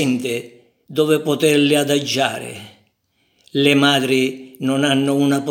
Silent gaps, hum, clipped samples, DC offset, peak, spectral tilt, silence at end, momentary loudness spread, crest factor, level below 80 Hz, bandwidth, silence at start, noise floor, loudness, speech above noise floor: none; none; under 0.1%; under 0.1%; 0 dBFS; -4.5 dB/octave; 0 s; 12 LU; 18 dB; -70 dBFS; 17.5 kHz; 0 s; -65 dBFS; -17 LUFS; 48 dB